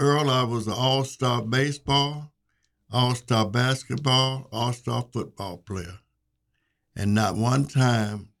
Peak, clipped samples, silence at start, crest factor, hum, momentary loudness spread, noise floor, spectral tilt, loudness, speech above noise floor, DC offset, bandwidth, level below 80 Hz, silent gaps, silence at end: -8 dBFS; under 0.1%; 0 s; 18 dB; none; 13 LU; -75 dBFS; -5 dB/octave; -24 LUFS; 51 dB; under 0.1%; 14 kHz; -56 dBFS; none; 0.15 s